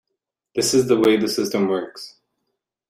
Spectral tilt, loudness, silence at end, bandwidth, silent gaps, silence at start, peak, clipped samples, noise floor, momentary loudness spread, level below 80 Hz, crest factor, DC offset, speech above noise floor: -4 dB/octave; -19 LUFS; 0.8 s; 16 kHz; none; 0.55 s; -6 dBFS; under 0.1%; -80 dBFS; 18 LU; -60 dBFS; 16 dB; under 0.1%; 61 dB